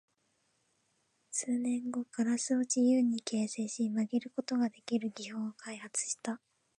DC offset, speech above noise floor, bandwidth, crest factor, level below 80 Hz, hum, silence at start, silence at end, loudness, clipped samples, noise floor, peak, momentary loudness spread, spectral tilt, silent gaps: under 0.1%; 43 dB; 11 kHz; 16 dB; -88 dBFS; none; 1.3 s; 0.4 s; -34 LUFS; under 0.1%; -77 dBFS; -18 dBFS; 11 LU; -4 dB/octave; none